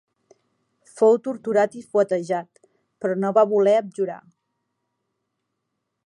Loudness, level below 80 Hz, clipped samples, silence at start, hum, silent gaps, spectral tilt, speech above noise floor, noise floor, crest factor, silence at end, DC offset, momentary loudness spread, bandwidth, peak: -21 LUFS; -80 dBFS; under 0.1%; 0.95 s; none; none; -6.5 dB/octave; 58 dB; -79 dBFS; 18 dB; 1.9 s; under 0.1%; 11 LU; 11 kHz; -4 dBFS